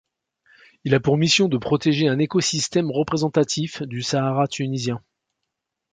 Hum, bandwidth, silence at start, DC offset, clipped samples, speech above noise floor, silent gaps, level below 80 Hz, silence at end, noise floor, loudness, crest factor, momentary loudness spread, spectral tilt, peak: none; 9.6 kHz; 0.85 s; under 0.1%; under 0.1%; 60 dB; none; -58 dBFS; 0.95 s; -81 dBFS; -21 LUFS; 20 dB; 10 LU; -5 dB/octave; -2 dBFS